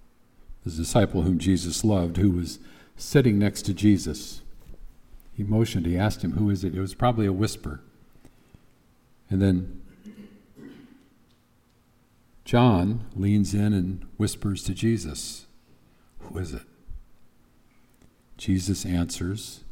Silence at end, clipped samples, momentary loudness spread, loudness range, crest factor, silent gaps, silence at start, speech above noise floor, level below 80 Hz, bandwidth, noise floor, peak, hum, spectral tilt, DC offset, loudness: 0 s; under 0.1%; 18 LU; 9 LU; 20 dB; none; 0.5 s; 38 dB; -44 dBFS; 16.5 kHz; -62 dBFS; -6 dBFS; none; -6 dB/octave; under 0.1%; -25 LUFS